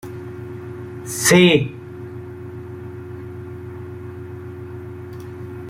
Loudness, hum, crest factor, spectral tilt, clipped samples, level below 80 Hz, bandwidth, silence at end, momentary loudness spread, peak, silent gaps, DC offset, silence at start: -15 LUFS; none; 22 dB; -4.5 dB/octave; under 0.1%; -56 dBFS; 16 kHz; 0 s; 20 LU; -2 dBFS; none; under 0.1%; 0.05 s